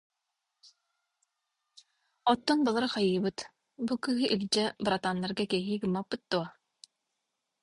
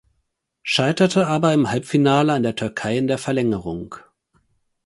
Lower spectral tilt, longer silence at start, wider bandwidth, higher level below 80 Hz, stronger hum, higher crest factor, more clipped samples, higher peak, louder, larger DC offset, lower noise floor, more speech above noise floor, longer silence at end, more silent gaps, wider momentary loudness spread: about the same, -5 dB/octave vs -5.5 dB/octave; first, 2.25 s vs 0.65 s; about the same, 11.5 kHz vs 11.5 kHz; second, -68 dBFS vs -54 dBFS; neither; about the same, 22 dB vs 18 dB; neither; second, -12 dBFS vs -2 dBFS; second, -30 LUFS vs -19 LUFS; neither; first, -85 dBFS vs -73 dBFS; about the same, 55 dB vs 54 dB; first, 1.15 s vs 0.85 s; neither; second, 8 LU vs 14 LU